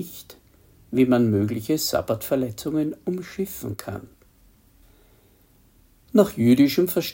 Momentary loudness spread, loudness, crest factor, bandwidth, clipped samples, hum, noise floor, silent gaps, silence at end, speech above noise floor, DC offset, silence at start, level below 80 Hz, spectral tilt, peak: 15 LU; -22 LUFS; 20 dB; 17 kHz; under 0.1%; none; -57 dBFS; none; 0 s; 35 dB; under 0.1%; 0 s; -56 dBFS; -6 dB/octave; -4 dBFS